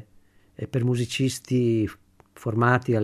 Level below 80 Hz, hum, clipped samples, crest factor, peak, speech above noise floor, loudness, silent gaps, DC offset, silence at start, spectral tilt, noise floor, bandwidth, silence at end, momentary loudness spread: -58 dBFS; none; under 0.1%; 18 dB; -6 dBFS; 33 dB; -25 LUFS; none; under 0.1%; 0.6 s; -6 dB/octave; -56 dBFS; 13.5 kHz; 0 s; 10 LU